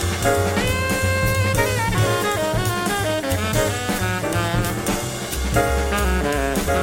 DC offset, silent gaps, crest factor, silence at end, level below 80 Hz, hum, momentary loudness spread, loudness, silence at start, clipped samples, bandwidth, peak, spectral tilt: under 0.1%; none; 16 dB; 0 s; -30 dBFS; none; 3 LU; -21 LUFS; 0 s; under 0.1%; 17 kHz; -4 dBFS; -4.5 dB/octave